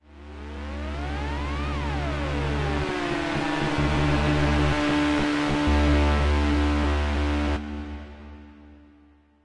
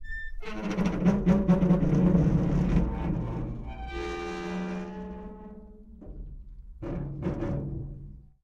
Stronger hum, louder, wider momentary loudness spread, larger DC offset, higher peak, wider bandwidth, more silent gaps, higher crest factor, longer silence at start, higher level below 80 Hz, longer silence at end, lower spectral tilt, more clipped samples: neither; first, -25 LUFS vs -28 LUFS; second, 15 LU vs 23 LU; neither; about the same, -12 dBFS vs -10 dBFS; first, 10.5 kHz vs 7.2 kHz; neither; about the same, 14 dB vs 18 dB; about the same, 0.1 s vs 0 s; first, -30 dBFS vs -38 dBFS; first, 0.7 s vs 0.2 s; second, -6.5 dB/octave vs -8.5 dB/octave; neither